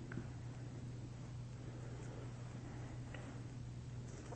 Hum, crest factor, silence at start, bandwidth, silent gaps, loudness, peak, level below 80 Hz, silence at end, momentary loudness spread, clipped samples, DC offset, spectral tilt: none; 18 dB; 0 s; 8.4 kHz; none; -50 LUFS; -30 dBFS; -60 dBFS; 0 s; 1 LU; under 0.1%; under 0.1%; -6.5 dB/octave